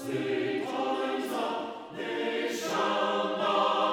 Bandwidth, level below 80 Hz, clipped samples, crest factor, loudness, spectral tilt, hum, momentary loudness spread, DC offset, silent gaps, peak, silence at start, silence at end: 18 kHz; -78 dBFS; under 0.1%; 16 dB; -30 LUFS; -4 dB/octave; none; 8 LU; under 0.1%; none; -14 dBFS; 0 s; 0 s